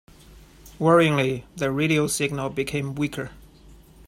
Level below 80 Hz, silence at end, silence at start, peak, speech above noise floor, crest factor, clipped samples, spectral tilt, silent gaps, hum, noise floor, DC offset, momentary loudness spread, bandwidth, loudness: -50 dBFS; 0.3 s; 0.3 s; -6 dBFS; 27 dB; 20 dB; under 0.1%; -5 dB/octave; none; none; -49 dBFS; under 0.1%; 10 LU; 16 kHz; -23 LUFS